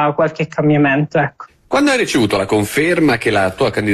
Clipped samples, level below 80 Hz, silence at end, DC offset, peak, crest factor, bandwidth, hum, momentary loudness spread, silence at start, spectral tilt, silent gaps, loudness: under 0.1%; -48 dBFS; 0 s; under 0.1%; -4 dBFS; 10 dB; 13 kHz; none; 4 LU; 0 s; -5.5 dB/octave; none; -15 LUFS